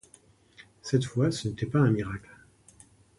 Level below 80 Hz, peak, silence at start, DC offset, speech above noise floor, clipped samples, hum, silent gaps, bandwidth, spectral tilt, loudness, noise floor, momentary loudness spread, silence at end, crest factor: -56 dBFS; -10 dBFS; 0.6 s; under 0.1%; 33 dB; under 0.1%; none; none; 11.5 kHz; -6.5 dB/octave; -28 LUFS; -59 dBFS; 14 LU; 1 s; 20 dB